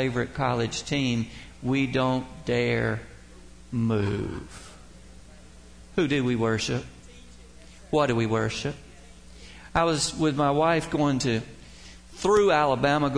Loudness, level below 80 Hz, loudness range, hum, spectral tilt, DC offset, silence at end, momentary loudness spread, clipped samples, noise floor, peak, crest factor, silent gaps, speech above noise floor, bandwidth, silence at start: -26 LUFS; -48 dBFS; 6 LU; none; -5.5 dB/octave; 0.2%; 0 s; 21 LU; under 0.1%; -49 dBFS; -10 dBFS; 18 dB; none; 24 dB; 10.5 kHz; 0 s